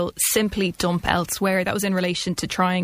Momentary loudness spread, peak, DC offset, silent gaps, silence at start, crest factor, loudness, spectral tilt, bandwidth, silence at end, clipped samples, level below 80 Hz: 4 LU; -2 dBFS; under 0.1%; none; 0 s; 20 dB; -22 LUFS; -4 dB/octave; 15.5 kHz; 0 s; under 0.1%; -46 dBFS